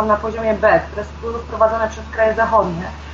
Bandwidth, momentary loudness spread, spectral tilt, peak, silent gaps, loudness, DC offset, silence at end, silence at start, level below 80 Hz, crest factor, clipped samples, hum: 7.4 kHz; 12 LU; -6.5 dB/octave; -2 dBFS; none; -18 LUFS; under 0.1%; 0 s; 0 s; -34 dBFS; 16 dB; under 0.1%; none